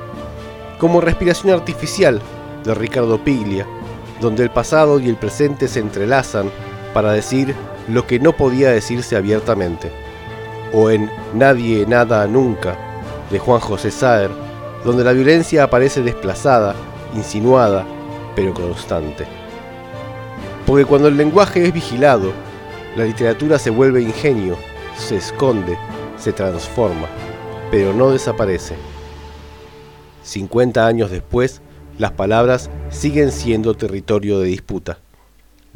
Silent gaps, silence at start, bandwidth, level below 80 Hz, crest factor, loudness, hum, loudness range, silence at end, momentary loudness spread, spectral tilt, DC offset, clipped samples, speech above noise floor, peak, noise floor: none; 0 s; 17.5 kHz; -36 dBFS; 16 dB; -16 LUFS; none; 5 LU; 0.8 s; 17 LU; -6 dB/octave; under 0.1%; under 0.1%; 34 dB; 0 dBFS; -49 dBFS